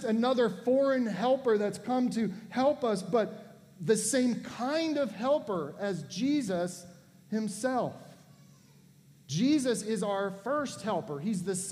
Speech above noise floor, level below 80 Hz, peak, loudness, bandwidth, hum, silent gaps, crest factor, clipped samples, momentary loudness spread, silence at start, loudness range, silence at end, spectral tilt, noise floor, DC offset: 29 dB; -74 dBFS; -14 dBFS; -30 LUFS; 15.5 kHz; none; none; 18 dB; under 0.1%; 9 LU; 0 s; 5 LU; 0 s; -5 dB/octave; -59 dBFS; under 0.1%